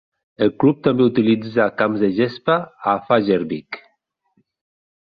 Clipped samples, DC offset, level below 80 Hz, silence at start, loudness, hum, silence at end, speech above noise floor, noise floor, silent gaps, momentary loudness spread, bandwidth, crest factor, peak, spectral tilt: under 0.1%; under 0.1%; -58 dBFS; 0.4 s; -19 LUFS; none; 1.25 s; 50 dB; -68 dBFS; none; 8 LU; 5 kHz; 18 dB; -2 dBFS; -9.5 dB/octave